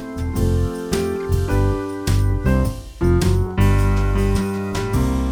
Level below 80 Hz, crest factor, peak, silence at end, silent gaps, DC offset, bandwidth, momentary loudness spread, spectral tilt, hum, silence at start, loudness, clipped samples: -24 dBFS; 14 dB; -4 dBFS; 0 s; none; under 0.1%; 18 kHz; 5 LU; -7 dB/octave; none; 0 s; -20 LUFS; under 0.1%